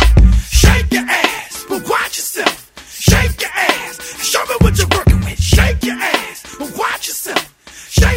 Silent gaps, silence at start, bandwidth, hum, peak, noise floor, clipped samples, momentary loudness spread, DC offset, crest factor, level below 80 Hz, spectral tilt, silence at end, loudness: none; 0 s; 16.5 kHz; none; 0 dBFS; -36 dBFS; under 0.1%; 13 LU; under 0.1%; 14 dB; -18 dBFS; -4 dB/octave; 0 s; -14 LUFS